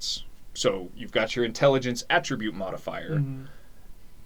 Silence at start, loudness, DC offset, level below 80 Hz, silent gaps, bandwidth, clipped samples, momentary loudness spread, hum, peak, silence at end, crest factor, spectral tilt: 0 s; -27 LUFS; 0.8%; -48 dBFS; none; 20 kHz; under 0.1%; 12 LU; none; -8 dBFS; 0.05 s; 20 dB; -4.5 dB/octave